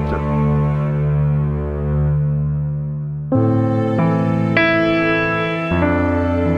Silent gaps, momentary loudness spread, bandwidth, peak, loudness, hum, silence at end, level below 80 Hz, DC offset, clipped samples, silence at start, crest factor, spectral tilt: none; 6 LU; 6 kHz; -2 dBFS; -17 LUFS; none; 0 s; -30 dBFS; under 0.1%; under 0.1%; 0 s; 14 dB; -9 dB/octave